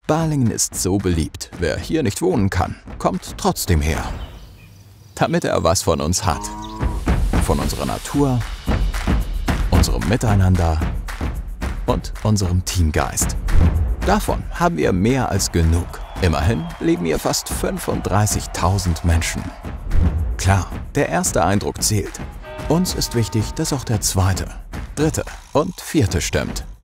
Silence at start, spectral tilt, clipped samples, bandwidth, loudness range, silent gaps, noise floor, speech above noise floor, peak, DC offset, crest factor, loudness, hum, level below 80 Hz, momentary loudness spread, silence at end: 0.1 s; -5 dB/octave; under 0.1%; 16 kHz; 2 LU; none; -43 dBFS; 25 dB; -2 dBFS; under 0.1%; 16 dB; -20 LUFS; none; -26 dBFS; 8 LU; 0.05 s